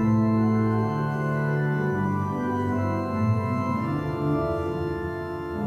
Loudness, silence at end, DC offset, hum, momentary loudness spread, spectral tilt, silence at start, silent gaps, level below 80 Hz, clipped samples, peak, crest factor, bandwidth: -26 LUFS; 0 s; under 0.1%; none; 7 LU; -9 dB/octave; 0 s; none; -48 dBFS; under 0.1%; -12 dBFS; 12 dB; 7.8 kHz